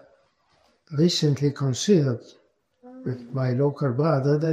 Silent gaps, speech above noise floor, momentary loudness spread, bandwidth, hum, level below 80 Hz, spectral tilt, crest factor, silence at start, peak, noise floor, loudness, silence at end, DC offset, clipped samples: none; 42 dB; 13 LU; 10.5 kHz; none; -66 dBFS; -6.5 dB/octave; 16 dB; 0.9 s; -8 dBFS; -64 dBFS; -24 LUFS; 0 s; under 0.1%; under 0.1%